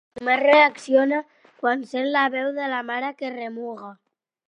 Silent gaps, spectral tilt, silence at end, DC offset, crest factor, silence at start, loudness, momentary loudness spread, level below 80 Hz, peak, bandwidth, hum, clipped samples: none; -3.5 dB/octave; 0.55 s; under 0.1%; 22 dB; 0.15 s; -21 LUFS; 16 LU; -74 dBFS; -2 dBFS; 10 kHz; none; under 0.1%